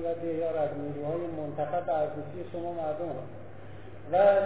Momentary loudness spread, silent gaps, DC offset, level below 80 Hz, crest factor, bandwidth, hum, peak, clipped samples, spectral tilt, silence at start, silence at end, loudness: 17 LU; none; 0.6%; -60 dBFS; 20 dB; 4 kHz; none; -10 dBFS; under 0.1%; -10.5 dB/octave; 0 s; 0 s; -31 LUFS